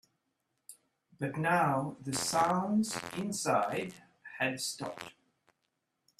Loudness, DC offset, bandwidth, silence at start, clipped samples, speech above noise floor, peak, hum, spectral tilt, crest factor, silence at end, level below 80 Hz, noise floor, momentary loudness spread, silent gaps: -32 LUFS; under 0.1%; 15 kHz; 0.7 s; under 0.1%; 50 dB; -16 dBFS; none; -4 dB/octave; 20 dB; 1.1 s; -72 dBFS; -82 dBFS; 15 LU; none